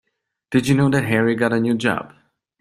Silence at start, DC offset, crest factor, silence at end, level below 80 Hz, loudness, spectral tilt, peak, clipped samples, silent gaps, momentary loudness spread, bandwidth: 0.5 s; under 0.1%; 18 dB; 0.55 s; -54 dBFS; -19 LUFS; -6.5 dB/octave; -2 dBFS; under 0.1%; none; 5 LU; 14.5 kHz